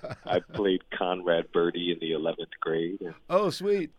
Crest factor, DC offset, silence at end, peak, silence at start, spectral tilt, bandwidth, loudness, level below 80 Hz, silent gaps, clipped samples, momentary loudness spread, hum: 18 dB; under 0.1%; 0.1 s; -10 dBFS; 0.05 s; -6 dB/octave; 13 kHz; -29 LUFS; -62 dBFS; none; under 0.1%; 5 LU; none